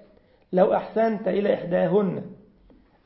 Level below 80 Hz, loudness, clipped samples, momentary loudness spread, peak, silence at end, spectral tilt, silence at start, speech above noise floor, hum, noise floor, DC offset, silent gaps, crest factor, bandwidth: -60 dBFS; -23 LUFS; under 0.1%; 7 LU; -6 dBFS; 0.7 s; -11.5 dB/octave; 0.5 s; 34 dB; none; -56 dBFS; under 0.1%; none; 18 dB; 5.8 kHz